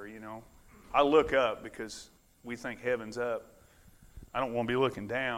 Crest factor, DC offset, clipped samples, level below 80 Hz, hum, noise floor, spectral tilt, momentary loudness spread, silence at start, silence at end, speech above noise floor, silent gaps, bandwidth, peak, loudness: 22 dB; under 0.1%; under 0.1%; -58 dBFS; none; -59 dBFS; -5 dB/octave; 20 LU; 0 s; 0 s; 28 dB; none; 16 kHz; -12 dBFS; -31 LUFS